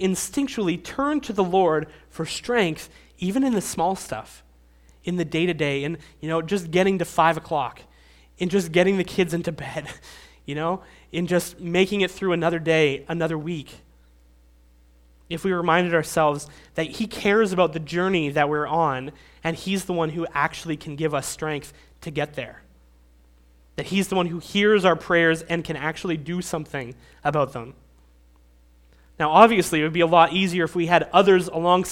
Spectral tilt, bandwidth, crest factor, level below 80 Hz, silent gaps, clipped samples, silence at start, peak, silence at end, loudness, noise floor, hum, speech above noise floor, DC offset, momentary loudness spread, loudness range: -5 dB/octave; 16.5 kHz; 24 dB; -52 dBFS; none; under 0.1%; 0 s; 0 dBFS; 0 s; -23 LUFS; -54 dBFS; none; 32 dB; under 0.1%; 14 LU; 7 LU